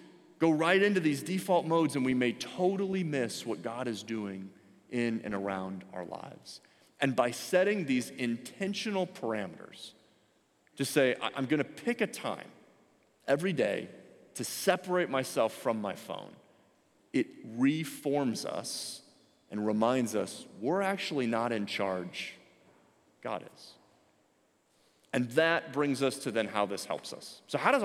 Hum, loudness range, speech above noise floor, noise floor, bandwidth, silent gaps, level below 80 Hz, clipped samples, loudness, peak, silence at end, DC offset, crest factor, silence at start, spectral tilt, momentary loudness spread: none; 5 LU; 39 dB; -70 dBFS; 16.5 kHz; none; -78 dBFS; under 0.1%; -32 LUFS; -10 dBFS; 0 s; under 0.1%; 24 dB; 0 s; -5 dB/octave; 15 LU